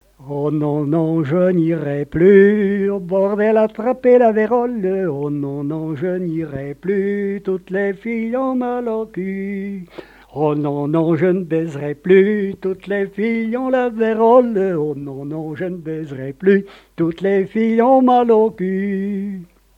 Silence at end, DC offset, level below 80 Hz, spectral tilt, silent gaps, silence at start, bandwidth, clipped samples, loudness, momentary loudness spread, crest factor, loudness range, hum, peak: 0.35 s; under 0.1%; -54 dBFS; -9.5 dB/octave; none; 0.2 s; 5.2 kHz; under 0.1%; -17 LUFS; 13 LU; 16 dB; 7 LU; none; 0 dBFS